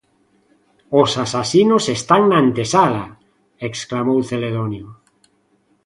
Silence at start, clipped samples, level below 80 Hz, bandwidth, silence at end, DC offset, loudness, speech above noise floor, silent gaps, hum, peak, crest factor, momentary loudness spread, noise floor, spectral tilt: 0.9 s; under 0.1%; -54 dBFS; 11.5 kHz; 0.95 s; under 0.1%; -17 LUFS; 45 dB; none; none; 0 dBFS; 18 dB; 13 LU; -61 dBFS; -5 dB/octave